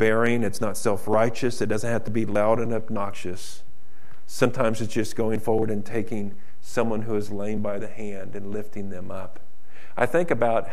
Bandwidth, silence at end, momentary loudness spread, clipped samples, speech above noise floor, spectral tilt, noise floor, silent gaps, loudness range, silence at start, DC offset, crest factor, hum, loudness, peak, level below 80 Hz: 15 kHz; 0 s; 14 LU; under 0.1%; 30 dB; -6 dB/octave; -55 dBFS; none; 5 LU; 0 s; 7%; 22 dB; none; -26 LUFS; -6 dBFS; -56 dBFS